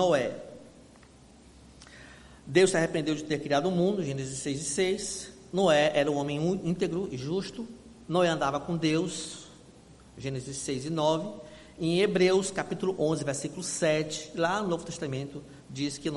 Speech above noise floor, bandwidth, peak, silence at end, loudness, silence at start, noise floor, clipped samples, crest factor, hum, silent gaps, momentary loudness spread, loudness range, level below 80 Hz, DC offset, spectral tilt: 26 dB; 11.5 kHz; -8 dBFS; 0 s; -29 LUFS; 0 s; -54 dBFS; under 0.1%; 20 dB; none; none; 17 LU; 3 LU; -60 dBFS; under 0.1%; -4.5 dB/octave